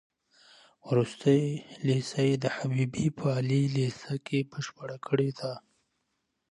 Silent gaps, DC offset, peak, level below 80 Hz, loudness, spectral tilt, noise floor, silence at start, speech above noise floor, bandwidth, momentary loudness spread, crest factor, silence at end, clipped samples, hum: none; under 0.1%; -12 dBFS; -66 dBFS; -29 LUFS; -7 dB/octave; -79 dBFS; 0.85 s; 51 dB; 11 kHz; 12 LU; 18 dB; 0.9 s; under 0.1%; none